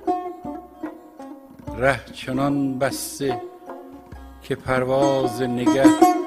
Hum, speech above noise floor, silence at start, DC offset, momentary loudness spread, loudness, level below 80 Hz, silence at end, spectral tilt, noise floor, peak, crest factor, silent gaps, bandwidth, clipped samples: none; 21 dB; 0 s; under 0.1%; 24 LU; -21 LUFS; -48 dBFS; 0 s; -5.5 dB/octave; -41 dBFS; 0 dBFS; 22 dB; none; 15.5 kHz; under 0.1%